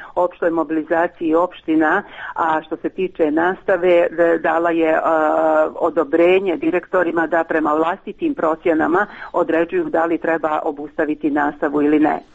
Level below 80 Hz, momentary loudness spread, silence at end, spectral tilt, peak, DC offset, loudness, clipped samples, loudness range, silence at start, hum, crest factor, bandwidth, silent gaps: -54 dBFS; 7 LU; 0.1 s; -7.5 dB/octave; -4 dBFS; under 0.1%; -18 LUFS; under 0.1%; 3 LU; 0 s; none; 14 dB; 7.8 kHz; none